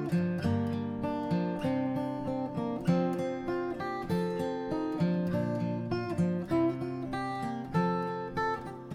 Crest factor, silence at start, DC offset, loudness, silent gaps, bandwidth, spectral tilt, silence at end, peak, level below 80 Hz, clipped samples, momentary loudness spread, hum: 16 dB; 0 s; under 0.1%; -32 LUFS; none; 12 kHz; -8 dB/octave; 0 s; -16 dBFS; -58 dBFS; under 0.1%; 5 LU; none